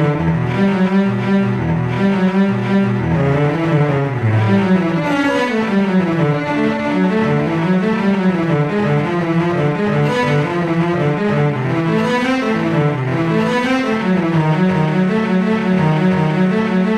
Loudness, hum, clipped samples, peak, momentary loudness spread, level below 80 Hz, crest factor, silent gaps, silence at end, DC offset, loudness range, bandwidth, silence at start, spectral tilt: -16 LUFS; none; under 0.1%; -4 dBFS; 2 LU; -44 dBFS; 12 dB; none; 0 s; 0.1%; 1 LU; 9.4 kHz; 0 s; -8 dB/octave